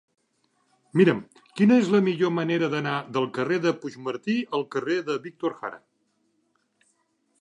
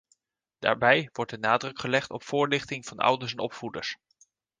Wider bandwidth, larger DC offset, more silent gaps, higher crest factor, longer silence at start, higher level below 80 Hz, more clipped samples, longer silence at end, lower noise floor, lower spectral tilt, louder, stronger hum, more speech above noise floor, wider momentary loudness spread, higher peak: about the same, 10.5 kHz vs 9.8 kHz; neither; neither; about the same, 20 dB vs 24 dB; first, 0.95 s vs 0.6 s; second, -74 dBFS vs -66 dBFS; neither; first, 1.65 s vs 0.65 s; second, -71 dBFS vs -76 dBFS; first, -7 dB/octave vs -4.5 dB/octave; about the same, -25 LUFS vs -27 LUFS; neither; about the same, 47 dB vs 48 dB; about the same, 12 LU vs 12 LU; about the same, -6 dBFS vs -4 dBFS